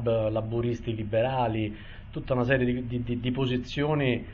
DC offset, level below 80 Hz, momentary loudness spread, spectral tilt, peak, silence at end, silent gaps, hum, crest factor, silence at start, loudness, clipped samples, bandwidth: under 0.1%; -44 dBFS; 7 LU; -8 dB/octave; -12 dBFS; 0 s; none; none; 16 dB; 0 s; -28 LUFS; under 0.1%; 7 kHz